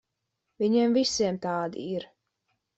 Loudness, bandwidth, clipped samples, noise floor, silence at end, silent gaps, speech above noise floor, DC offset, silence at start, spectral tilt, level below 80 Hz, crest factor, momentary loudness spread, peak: -27 LUFS; 8.2 kHz; under 0.1%; -82 dBFS; 0.75 s; none; 56 dB; under 0.1%; 0.6 s; -4.5 dB/octave; -66 dBFS; 16 dB; 12 LU; -14 dBFS